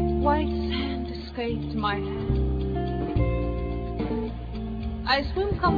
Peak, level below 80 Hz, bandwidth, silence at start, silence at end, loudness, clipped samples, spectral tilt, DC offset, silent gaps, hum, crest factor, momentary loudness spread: -10 dBFS; -32 dBFS; 5 kHz; 0 s; 0 s; -28 LUFS; under 0.1%; -8.5 dB/octave; under 0.1%; none; none; 16 dB; 8 LU